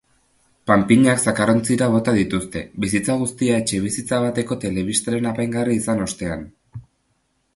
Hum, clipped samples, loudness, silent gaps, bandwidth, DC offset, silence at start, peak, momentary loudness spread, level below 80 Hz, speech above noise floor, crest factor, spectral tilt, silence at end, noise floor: none; under 0.1%; -20 LUFS; none; 11.5 kHz; under 0.1%; 0.65 s; 0 dBFS; 10 LU; -48 dBFS; 48 dB; 20 dB; -5 dB/octave; 0.75 s; -67 dBFS